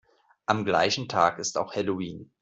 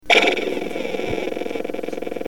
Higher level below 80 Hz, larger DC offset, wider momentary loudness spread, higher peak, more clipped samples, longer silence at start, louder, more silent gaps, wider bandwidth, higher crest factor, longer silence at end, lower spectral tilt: second, -66 dBFS vs -46 dBFS; second, under 0.1% vs 2%; second, 10 LU vs 13 LU; second, -6 dBFS vs 0 dBFS; neither; first, 0.5 s vs 0 s; second, -26 LUFS vs -22 LUFS; neither; second, 8.2 kHz vs 17.5 kHz; about the same, 22 dB vs 22 dB; first, 0.15 s vs 0 s; about the same, -3.5 dB/octave vs -3 dB/octave